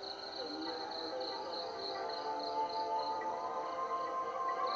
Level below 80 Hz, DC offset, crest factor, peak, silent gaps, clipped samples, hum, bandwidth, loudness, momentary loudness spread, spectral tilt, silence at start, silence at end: -78 dBFS; under 0.1%; 14 dB; -26 dBFS; none; under 0.1%; none; 7.6 kHz; -39 LUFS; 4 LU; 0 dB/octave; 0 s; 0 s